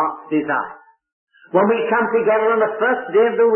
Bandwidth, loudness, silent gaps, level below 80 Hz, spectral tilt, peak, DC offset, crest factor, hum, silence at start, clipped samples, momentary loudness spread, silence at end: 3.2 kHz; -18 LUFS; 1.13-1.27 s; -68 dBFS; -11 dB/octave; -4 dBFS; under 0.1%; 14 dB; none; 0 s; under 0.1%; 6 LU; 0 s